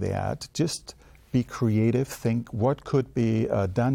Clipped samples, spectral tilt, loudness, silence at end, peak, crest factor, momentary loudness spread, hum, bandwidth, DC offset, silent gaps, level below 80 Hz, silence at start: under 0.1%; -7 dB/octave; -26 LUFS; 0 s; -12 dBFS; 14 dB; 6 LU; none; 16 kHz; under 0.1%; none; -52 dBFS; 0 s